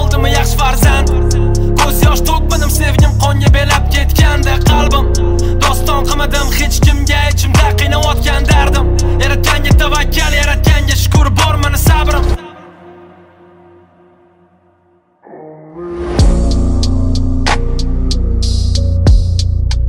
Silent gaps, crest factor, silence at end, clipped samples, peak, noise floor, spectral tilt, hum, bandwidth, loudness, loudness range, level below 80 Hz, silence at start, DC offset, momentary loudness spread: none; 10 dB; 0 s; under 0.1%; 0 dBFS; -53 dBFS; -5 dB/octave; none; 16.5 kHz; -12 LUFS; 7 LU; -14 dBFS; 0 s; under 0.1%; 5 LU